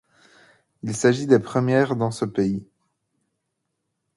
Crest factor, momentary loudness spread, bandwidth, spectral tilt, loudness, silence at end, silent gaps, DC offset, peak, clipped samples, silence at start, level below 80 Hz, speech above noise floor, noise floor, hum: 22 dB; 12 LU; 11.5 kHz; -6 dB/octave; -22 LUFS; 1.55 s; none; under 0.1%; -2 dBFS; under 0.1%; 0.85 s; -60 dBFS; 57 dB; -78 dBFS; none